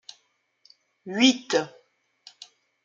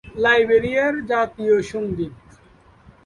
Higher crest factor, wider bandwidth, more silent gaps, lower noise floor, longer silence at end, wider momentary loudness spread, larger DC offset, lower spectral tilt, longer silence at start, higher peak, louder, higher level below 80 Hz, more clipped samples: first, 24 dB vs 16 dB; second, 7.6 kHz vs 11 kHz; neither; first, -69 dBFS vs -51 dBFS; first, 1.2 s vs 0.9 s; first, 26 LU vs 11 LU; neither; second, -2.5 dB/octave vs -5.5 dB/octave; first, 1.05 s vs 0.05 s; about the same, -4 dBFS vs -4 dBFS; second, -23 LUFS vs -19 LUFS; second, -80 dBFS vs -50 dBFS; neither